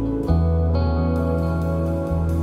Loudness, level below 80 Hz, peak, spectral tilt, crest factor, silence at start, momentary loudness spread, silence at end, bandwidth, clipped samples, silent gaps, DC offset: -21 LUFS; -26 dBFS; -6 dBFS; -9.5 dB/octave; 14 dB; 0 s; 3 LU; 0 s; 5 kHz; under 0.1%; none; under 0.1%